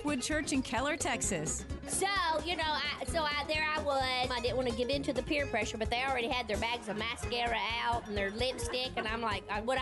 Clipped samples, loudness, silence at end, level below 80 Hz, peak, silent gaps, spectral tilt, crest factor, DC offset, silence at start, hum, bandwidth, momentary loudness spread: under 0.1%; -33 LUFS; 0 s; -48 dBFS; -20 dBFS; none; -3 dB/octave; 12 dB; under 0.1%; 0 s; none; 11.5 kHz; 4 LU